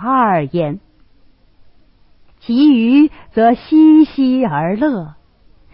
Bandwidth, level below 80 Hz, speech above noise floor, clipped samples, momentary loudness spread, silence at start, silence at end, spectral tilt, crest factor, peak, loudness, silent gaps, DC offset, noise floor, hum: 5.6 kHz; -50 dBFS; 37 dB; under 0.1%; 14 LU; 0 s; 0.65 s; -12 dB/octave; 12 dB; -2 dBFS; -13 LUFS; none; under 0.1%; -49 dBFS; none